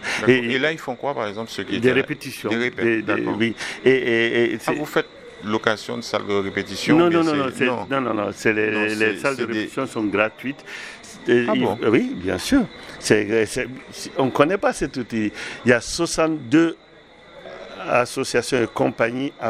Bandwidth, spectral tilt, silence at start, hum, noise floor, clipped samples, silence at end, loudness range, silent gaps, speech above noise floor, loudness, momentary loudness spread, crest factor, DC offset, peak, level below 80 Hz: 15 kHz; -4.5 dB/octave; 0 s; none; -47 dBFS; under 0.1%; 0 s; 2 LU; none; 26 dB; -21 LUFS; 11 LU; 20 dB; under 0.1%; 0 dBFS; -52 dBFS